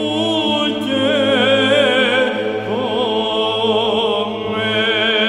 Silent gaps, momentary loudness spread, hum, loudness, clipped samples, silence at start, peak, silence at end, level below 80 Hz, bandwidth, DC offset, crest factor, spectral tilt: none; 7 LU; none; -16 LUFS; under 0.1%; 0 s; -4 dBFS; 0 s; -54 dBFS; 11.5 kHz; under 0.1%; 12 dB; -4.5 dB/octave